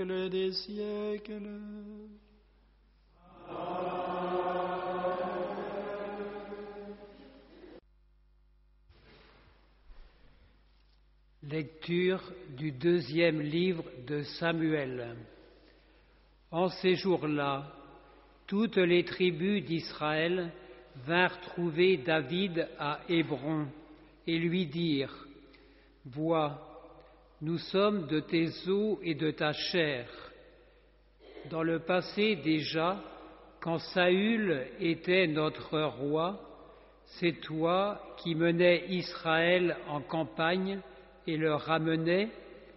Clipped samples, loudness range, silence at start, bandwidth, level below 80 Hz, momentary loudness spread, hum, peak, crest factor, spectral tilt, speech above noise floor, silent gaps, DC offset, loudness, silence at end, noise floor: under 0.1%; 9 LU; 0 s; 5.8 kHz; -64 dBFS; 17 LU; none; -10 dBFS; 22 dB; -4 dB/octave; 34 dB; none; under 0.1%; -32 LUFS; 0.05 s; -65 dBFS